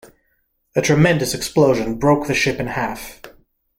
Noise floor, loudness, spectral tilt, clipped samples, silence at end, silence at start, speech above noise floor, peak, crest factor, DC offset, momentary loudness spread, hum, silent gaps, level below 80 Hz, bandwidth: -66 dBFS; -18 LUFS; -5 dB/octave; under 0.1%; 0.5 s; 0.75 s; 49 dB; -2 dBFS; 16 dB; under 0.1%; 10 LU; none; none; -44 dBFS; 16.5 kHz